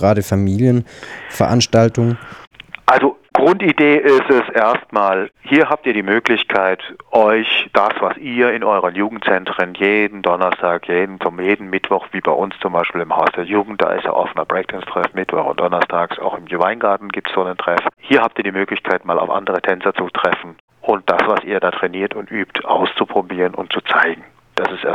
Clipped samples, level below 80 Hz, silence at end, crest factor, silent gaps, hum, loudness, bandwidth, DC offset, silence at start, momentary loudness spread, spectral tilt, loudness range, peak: under 0.1%; -54 dBFS; 0 s; 16 dB; 2.47-2.51 s, 20.60-20.68 s; none; -16 LUFS; 16 kHz; under 0.1%; 0 s; 8 LU; -5.5 dB/octave; 4 LU; 0 dBFS